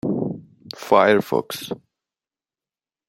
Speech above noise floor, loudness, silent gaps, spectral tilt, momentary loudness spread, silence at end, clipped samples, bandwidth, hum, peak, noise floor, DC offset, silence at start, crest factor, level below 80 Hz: over 71 dB; -20 LUFS; none; -5.5 dB/octave; 21 LU; 1.3 s; under 0.1%; 16.5 kHz; none; -2 dBFS; under -90 dBFS; under 0.1%; 0.05 s; 22 dB; -64 dBFS